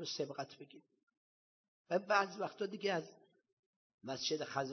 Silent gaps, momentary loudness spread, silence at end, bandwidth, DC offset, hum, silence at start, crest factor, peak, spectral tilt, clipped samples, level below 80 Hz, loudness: 1.03-1.07 s, 1.17-1.85 s, 3.53-3.98 s; 20 LU; 0 s; 6.4 kHz; under 0.1%; none; 0 s; 24 dB; -18 dBFS; -3.5 dB/octave; under 0.1%; -88 dBFS; -39 LUFS